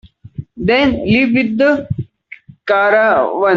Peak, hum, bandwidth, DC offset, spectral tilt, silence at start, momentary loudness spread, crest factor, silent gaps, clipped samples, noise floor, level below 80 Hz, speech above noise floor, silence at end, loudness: -2 dBFS; none; 7.2 kHz; under 0.1%; -7.5 dB/octave; 0.4 s; 20 LU; 12 dB; none; under 0.1%; -39 dBFS; -42 dBFS; 27 dB; 0 s; -13 LUFS